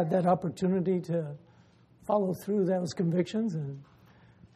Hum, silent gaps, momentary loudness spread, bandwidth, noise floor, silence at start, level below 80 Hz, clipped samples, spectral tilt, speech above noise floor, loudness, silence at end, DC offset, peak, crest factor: none; none; 14 LU; 14 kHz; -60 dBFS; 0 s; -68 dBFS; under 0.1%; -8 dB/octave; 31 dB; -30 LUFS; 0.7 s; under 0.1%; -14 dBFS; 16 dB